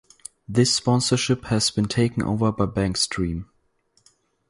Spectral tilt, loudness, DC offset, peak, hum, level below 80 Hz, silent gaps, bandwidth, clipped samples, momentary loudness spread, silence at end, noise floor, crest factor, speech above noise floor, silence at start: -4.5 dB/octave; -22 LUFS; under 0.1%; -6 dBFS; none; -44 dBFS; none; 11.5 kHz; under 0.1%; 9 LU; 1.05 s; -65 dBFS; 18 dB; 44 dB; 0.5 s